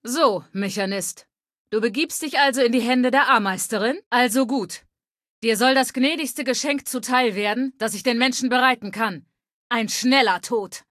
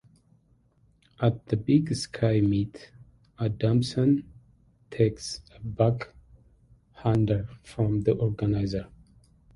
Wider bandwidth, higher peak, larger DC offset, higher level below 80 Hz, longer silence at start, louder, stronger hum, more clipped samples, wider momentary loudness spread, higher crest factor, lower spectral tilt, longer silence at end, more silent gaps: first, 14.5 kHz vs 11.5 kHz; first, -4 dBFS vs -8 dBFS; neither; second, -72 dBFS vs -50 dBFS; second, 0.05 s vs 1.2 s; first, -21 LUFS vs -27 LUFS; neither; neither; second, 9 LU vs 13 LU; about the same, 18 dB vs 20 dB; second, -3 dB/octave vs -7.5 dB/octave; second, 0.1 s vs 0.7 s; first, 1.58-1.65 s, 4.06-4.11 s, 5.11-5.15 s, 5.28-5.42 s, 9.53-9.70 s vs none